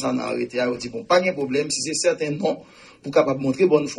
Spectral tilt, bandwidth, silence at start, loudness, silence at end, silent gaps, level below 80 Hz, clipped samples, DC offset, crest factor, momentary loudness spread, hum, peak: -4 dB/octave; 11.5 kHz; 0 s; -22 LUFS; 0 s; none; -60 dBFS; under 0.1%; under 0.1%; 18 dB; 7 LU; none; -4 dBFS